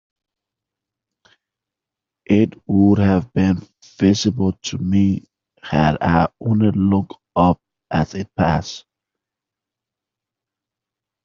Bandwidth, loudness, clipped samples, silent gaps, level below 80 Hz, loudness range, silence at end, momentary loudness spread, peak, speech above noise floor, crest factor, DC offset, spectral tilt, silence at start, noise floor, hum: 7.4 kHz; -18 LUFS; under 0.1%; none; -46 dBFS; 5 LU; 2.45 s; 9 LU; -2 dBFS; 69 dB; 18 dB; under 0.1%; -6.5 dB/octave; 2.3 s; -86 dBFS; none